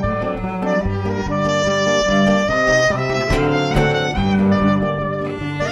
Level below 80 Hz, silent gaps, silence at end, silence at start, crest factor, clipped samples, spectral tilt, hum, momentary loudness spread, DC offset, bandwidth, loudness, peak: -32 dBFS; none; 0 s; 0 s; 14 dB; under 0.1%; -5.5 dB/octave; none; 7 LU; under 0.1%; 11 kHz; -17 LUFS; -4 dBFS